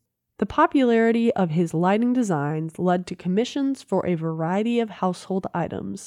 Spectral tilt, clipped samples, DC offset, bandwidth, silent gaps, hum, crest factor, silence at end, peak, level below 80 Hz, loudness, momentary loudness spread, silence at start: -7 dB/octave; under 0.1%; under 0.1%; 11.5 kHz; none; none; 16 dB; 0 s; -8 dBFS; -58 dBFS; -23 LUFS; 9 LU; 0.4 s